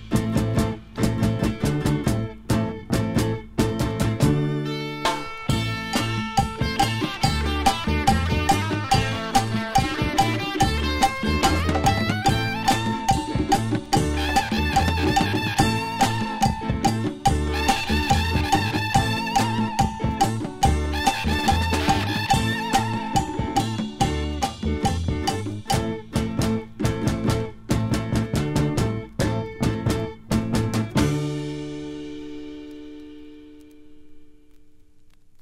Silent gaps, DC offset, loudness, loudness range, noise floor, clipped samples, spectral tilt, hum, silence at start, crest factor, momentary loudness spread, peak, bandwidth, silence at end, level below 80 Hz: none; under 0.1%; -23 LUFS; 4 LU; -49 dBFS; under 0.1%; -5 dB/octave; none; 0 s; 20 dB; 6 LU; -4 dBFS; 16 kHz; 0 s; -34 dBFS